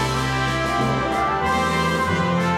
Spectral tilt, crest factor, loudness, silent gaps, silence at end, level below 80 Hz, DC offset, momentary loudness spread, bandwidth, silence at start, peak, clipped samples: -5 dB/octave; 12 dB; -21 LUFS; none; 0 s; -38 dBFS; under 0.1%; 1 LU; 16 kHz; 0 s; -8 dBFS; under 0.1%